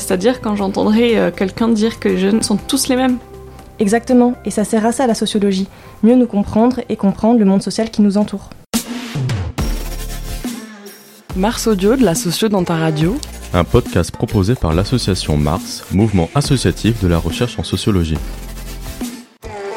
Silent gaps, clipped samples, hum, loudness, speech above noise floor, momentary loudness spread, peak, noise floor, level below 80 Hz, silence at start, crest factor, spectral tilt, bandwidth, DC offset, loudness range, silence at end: none; under 0.1%; none; -16 LUFS; 23 dB; 14 LU; 0 dBFS; -38 dBFS; -30 dBFS; 0 s; 16 dB; -5.5 dB/octave; 16.5 kHz; under 0.1%; 4 LU; 0 s